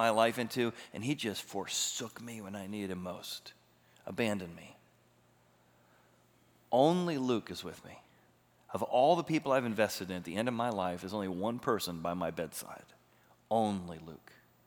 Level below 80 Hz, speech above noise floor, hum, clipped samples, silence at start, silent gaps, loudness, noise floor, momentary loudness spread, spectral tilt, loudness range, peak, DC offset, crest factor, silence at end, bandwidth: -76 dBFS; 33 dB; 60 Hz at -65 dBFS; under 0.1%; 0 s; none; -34 LUFS; -67 dBFS; 18 LU; -4.5 dB/octave; 9 LU; -12 dBFS; under 0.1%; 22 dB; 0.5 s; over 20 kHz